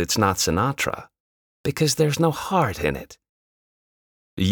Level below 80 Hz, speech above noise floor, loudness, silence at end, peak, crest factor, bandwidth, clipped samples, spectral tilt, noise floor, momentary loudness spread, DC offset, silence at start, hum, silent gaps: -48 dBFS; over 68 dB; -22 LUFS; 0 s; -6 dBFS; 18 dB; over 20 kHz; under 0.1%; -4.5 dB/octave; under -90 dBFS; 12 LU; under 0.1%; 0 s; none; 1.20-1.64 s, 3.29-4.37 s